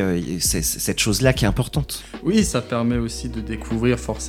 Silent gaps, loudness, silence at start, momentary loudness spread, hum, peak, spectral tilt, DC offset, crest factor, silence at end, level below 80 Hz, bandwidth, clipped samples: none; -21 LUFS; 0 s; 10 LU; none; -2 dBFS; -4.5 dB/octave; under 0.1%; 20 dB; 0 s; -34 dBFS; 18 kHz; under 0.1%